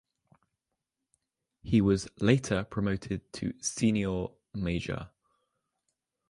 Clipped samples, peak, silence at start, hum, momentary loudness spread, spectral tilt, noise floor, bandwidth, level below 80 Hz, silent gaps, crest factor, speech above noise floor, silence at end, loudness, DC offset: under 0.1%; -10 dBFS; 1.65 s; none; 12 LU; -6 dB/octave; -86 dBFS; 11.5 kHz; -52 dBFS; none; 22 dB; 57 dB; 1.25 s; -30 LUFS; under 0.1%